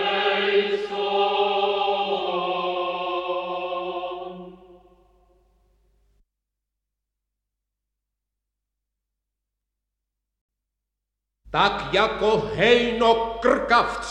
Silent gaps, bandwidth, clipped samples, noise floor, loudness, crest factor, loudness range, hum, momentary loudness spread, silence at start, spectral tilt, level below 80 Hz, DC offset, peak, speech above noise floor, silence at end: 10.41-10.49 s; 10 kHz; under 0.1%; -83 dBFS; -22 LUFS; 22 dB; 14 LU; 50 Hz at -65 dBFS; 10 LU; 0 s; -4.5 dB/octave; -52 dBFS; under 0.1%; -4 dBFS; 63 dB; 0 s